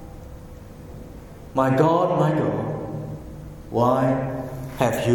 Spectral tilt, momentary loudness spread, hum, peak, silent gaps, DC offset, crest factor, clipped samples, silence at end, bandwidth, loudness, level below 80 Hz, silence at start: -7.5 dB/octave; 22 LU; none; -4 dBFS; none; under 0.1%; 20 dB; under 0.1%; 0 s; 17.5 kHz; -22 LUFS; -44 dBFS; 0 s